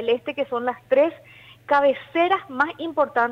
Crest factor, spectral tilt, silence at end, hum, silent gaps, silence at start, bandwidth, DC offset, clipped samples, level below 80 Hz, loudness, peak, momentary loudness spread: 14 dB; -5.5 dB/octave; 0 s; none; none; 0 s; 6.6 kHz; under 0.1%; under 0.1%; -66 dBFS; -22 LUFS; -8 dBFS; 6 LU